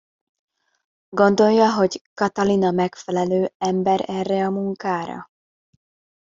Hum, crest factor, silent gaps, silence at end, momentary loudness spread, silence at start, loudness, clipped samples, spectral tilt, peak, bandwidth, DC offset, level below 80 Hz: none; 20 dB; 2.01-2.16 s, 3.55-3.60 s; 1.05 s; 10 LU; 1.1 s; -20 LUFS; under 0.1%; -6 dB/octave; -2 dBFS; 7.6 kHz; under 0.1%; -62 dBFS